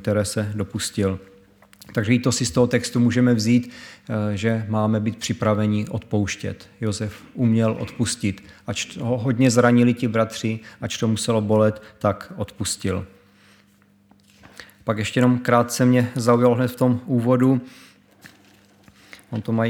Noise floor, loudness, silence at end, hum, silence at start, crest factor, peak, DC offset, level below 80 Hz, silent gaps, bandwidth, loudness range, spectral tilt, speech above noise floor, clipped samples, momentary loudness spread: -57 dBFS; -21 LUFS; 0 s; none; 0 s; 20 dB; -2 dBFS; under 0.1%; -54 dBFS; none; 17.5 kHz; 5 LU; -6 dB/octave; 36 dB; under 0.1%; 12 LU